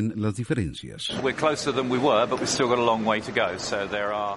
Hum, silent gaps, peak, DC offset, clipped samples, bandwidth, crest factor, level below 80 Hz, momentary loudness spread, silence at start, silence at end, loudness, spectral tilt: none; none; -6 dBFS; under 0.1%; under 0.1%; 11.5 kHz; 18 dB; -52 dBFS; 7 LU; 0 s; 0 s; -25 LUFS; -4.5 dB/octave